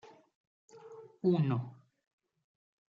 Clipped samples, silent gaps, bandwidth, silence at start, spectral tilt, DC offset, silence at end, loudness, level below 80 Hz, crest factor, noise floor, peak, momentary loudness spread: under 0.1%; 0.35-0.68 s; 7.4 kHz; 0.05 s; -9.5 dB/octave; under 0.1%; 1.2 s; -33 LUFS; -80 dBFS; 18 dB; -53 dBFS; -18 dBFS; 23 LU